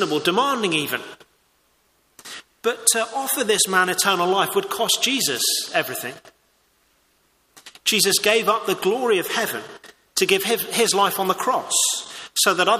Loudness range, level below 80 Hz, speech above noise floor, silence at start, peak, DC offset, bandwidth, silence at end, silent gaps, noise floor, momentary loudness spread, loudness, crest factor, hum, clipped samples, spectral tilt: 4 LU; -68 dBFS; 43 dB; 0 s; 0 dBFS; under 0.1%; 15.5 kHz; 0 s; none; -63 dBFS; 10 LU; -20 LUFS; 22 dB; none; under 0.1%; -1.5 dB/octave